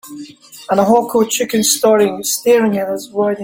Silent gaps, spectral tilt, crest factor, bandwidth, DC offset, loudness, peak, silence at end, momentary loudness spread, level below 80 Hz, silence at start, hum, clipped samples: none; -3.5 dB/octave; 14 dB; 17 kHz; under 0.1%; -14 LUFS; 0 dBFS; 0 s; 21 LU; -58 dBFS; 0.05 s; none; under 0.1%